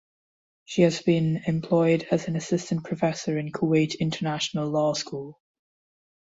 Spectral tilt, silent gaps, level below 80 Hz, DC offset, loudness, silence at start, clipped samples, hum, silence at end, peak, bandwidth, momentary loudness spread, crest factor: -6 dB/octave; none; -62 dBFS; under 0.1%; -25 LUFS; 0.7 s; under 0.1%; none; 0.9 s; -8 dBFS; 8 kHz; 8 LU; 18 dB